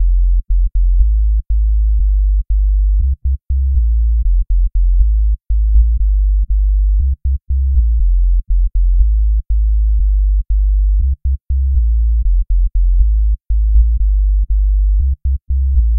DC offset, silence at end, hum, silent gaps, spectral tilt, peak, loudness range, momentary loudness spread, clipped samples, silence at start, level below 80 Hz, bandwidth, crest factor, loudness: 0.7%; 0 s; none; none; -16 dB/octave; 0 dBFS; 1 LU; 3 LU; under 0.1%; 0 s; -12 dBFS; 0.3 kHz; 10 dB; -16 LUFS